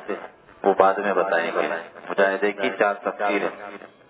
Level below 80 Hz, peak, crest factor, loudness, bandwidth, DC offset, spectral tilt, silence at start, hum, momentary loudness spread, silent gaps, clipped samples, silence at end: -72 dBFS; -2 dBFS; 22 dB; -22 LUFS; 4 kHz; under 0.1%; -8.5 dB/octave; 0 s; none; 15 LU; none; under 0.1%; 0.2 s